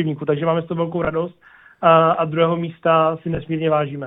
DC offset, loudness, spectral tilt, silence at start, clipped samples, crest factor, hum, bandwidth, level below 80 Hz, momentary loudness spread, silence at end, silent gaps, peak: under 0.1%; -19 LUFS; -10.5 dB/octave; 0 s; under 0.1%; 16 dB; none; 3.9 kHz; -50 dBFS; 10 LU; 0 s; none; -2 dBFS